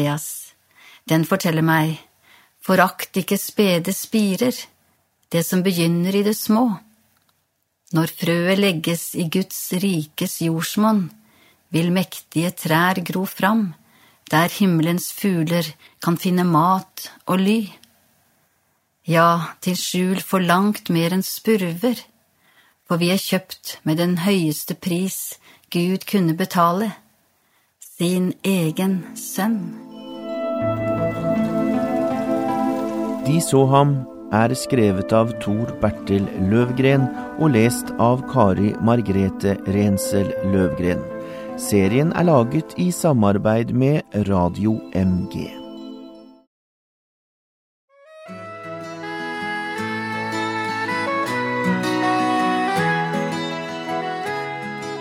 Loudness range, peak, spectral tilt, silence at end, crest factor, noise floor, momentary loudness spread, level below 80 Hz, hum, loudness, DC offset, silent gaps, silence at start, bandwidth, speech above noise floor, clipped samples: 5 LU; -2 dBFS; -5.5 dB/octave; 0 s; 20 dB; -70 dBFS; 11 LU; -54 dBFS; none; -20 LUFS; under 0.1%; 46.47-47.88 s; 0 s; 16 kHz; 51 dB; under 0.1%